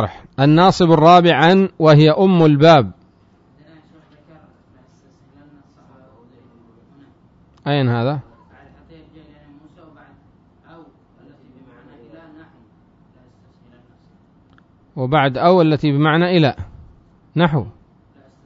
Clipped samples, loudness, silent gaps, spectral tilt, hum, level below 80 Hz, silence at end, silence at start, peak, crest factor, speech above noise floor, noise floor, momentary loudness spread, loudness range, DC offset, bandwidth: under 0.1%; -14 LUFS; none; -7.5 dB/octave; none; -50 dBFS; 0.75 s; 0 s; 0 dBFS; 18 dB; 40 dB; -53 dBFS; 17 LU; 15 LU; under 0.1%; 7.8 kHz